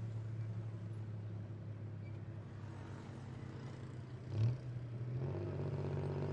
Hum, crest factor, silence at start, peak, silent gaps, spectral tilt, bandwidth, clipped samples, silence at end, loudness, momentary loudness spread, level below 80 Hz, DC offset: none; 18 dB; 0 s; -26 dBFS; none; -9 dB/octave; 8.2 kHz; under 0.1%; 0 s; -45 LUFS; 11 LU; -66 dBFS; under 0.1%